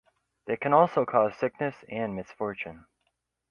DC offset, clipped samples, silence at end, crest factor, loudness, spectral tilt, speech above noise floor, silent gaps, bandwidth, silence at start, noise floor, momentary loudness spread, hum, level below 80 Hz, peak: under 0.1%; under 0.1%; 0.75 s; 22 dB; -27 LUFS; -8 dB/octave; 51 dB; none; 6.8 kHz; 0.45 s; -78 dBFS; 14 LU; none; -66 dBFS; -6 dBFS